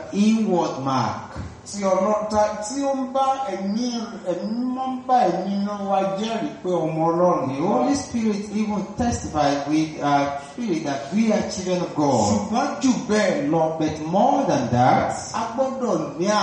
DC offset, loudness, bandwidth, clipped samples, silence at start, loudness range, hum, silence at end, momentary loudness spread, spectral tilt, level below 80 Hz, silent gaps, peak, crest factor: under 0.1%; -22 LUFS; 10 kHz; under 0.1%; 0 s; 3 LU; none; 0 s; 7 LU; -5.5 dB/octave; -50 dBFS; none; -6 dBFS; 16 dB